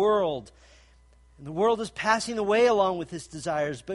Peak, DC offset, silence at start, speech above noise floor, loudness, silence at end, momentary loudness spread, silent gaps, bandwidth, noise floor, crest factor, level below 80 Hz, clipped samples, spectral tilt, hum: -8 dBFS; under 0.1%; 0 s; 31 dB; -26 LUFS; 0 s; 15 LU; none; 11.5 kHz; -57 dBFS; 18 dB; -58 dBFS; under 0.1%; -4.5 dB/octave; none